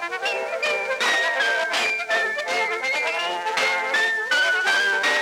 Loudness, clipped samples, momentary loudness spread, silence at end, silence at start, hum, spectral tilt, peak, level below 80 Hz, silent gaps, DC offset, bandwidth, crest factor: -21 LUFS; under 0.1%; 5 LU; 0 s; 0 s; none; 0.5 dB/octave; -8 dBFS; -76 dBFS; none; under 0.1%; 18 kHz; 14 dB